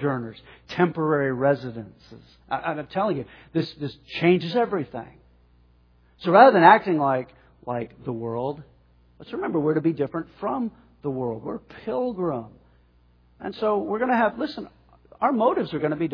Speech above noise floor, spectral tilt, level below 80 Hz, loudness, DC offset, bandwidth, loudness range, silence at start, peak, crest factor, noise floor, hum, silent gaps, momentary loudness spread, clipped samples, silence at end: 35 dB; -8.5 dB/octave; -60 dBFS; -23 LUFS; under 0.1%; 5.4 kHz; 9 LU; 0 s; 0 dBFS; 24 dB; -58 dBFS; 60 Hz at -50 dBFS; none; 16 LU; under 0.1%; 0 s